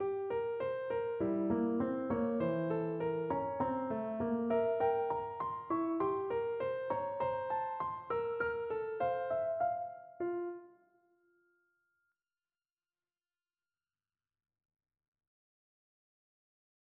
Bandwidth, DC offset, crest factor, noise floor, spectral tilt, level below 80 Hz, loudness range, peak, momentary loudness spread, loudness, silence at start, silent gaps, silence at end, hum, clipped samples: 4.5 kHz; under 0.1%; 16 dB; under -90 dBFS; -6.5 dB/octave; -70 dBFS; 7 LU; -22 dBFS; 6 LU; -36 LUFS; 0 s; none; 6.3 s; none; under 0.1%